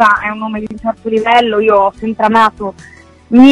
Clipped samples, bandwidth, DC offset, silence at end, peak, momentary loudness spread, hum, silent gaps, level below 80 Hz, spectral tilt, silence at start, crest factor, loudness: 2%; 10.5 kHz; under 0.1%; 0 s; 0 dBFS; 11 LU; none; none; -44 dBFS; -5.5 dB/octave; 0 s; 12 dB; -12 LUFS